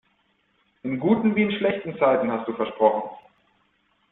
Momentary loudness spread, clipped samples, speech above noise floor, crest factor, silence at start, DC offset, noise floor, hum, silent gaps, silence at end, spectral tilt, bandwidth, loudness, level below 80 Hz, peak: 10 LU; under 0.1%; 45 dB; 20 dB; 0.85 s; under 0.1%; -67 dBFS; none; none; 0.95 s; -10.5 dB/octave; 4 kHz; -23 LUFS; -64 dBFS; -6 dBFS